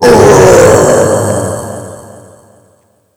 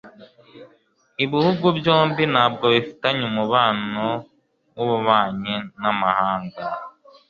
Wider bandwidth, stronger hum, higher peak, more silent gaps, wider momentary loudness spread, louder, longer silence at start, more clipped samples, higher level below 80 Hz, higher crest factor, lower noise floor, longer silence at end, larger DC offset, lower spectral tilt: first, over 20 kHz vs 7 kHz; neither; about the same, 0 dBFS vs -2 dBFS; neither; first, 20 LU vs 12 LU; first, -6 LUFS vs -20 LUFS; about the same, 0 s vs 0.05 s; first, 6% vs under 0.1%; first, -32 dBFS vs -60 dBFS; second, 8 dB vs 20 dB; second, -50 dBFS vs -60 dBFS; first, 1.15 s vs 0.4 s; neither; second, -5 dB/octave vs -7.5 dB/octave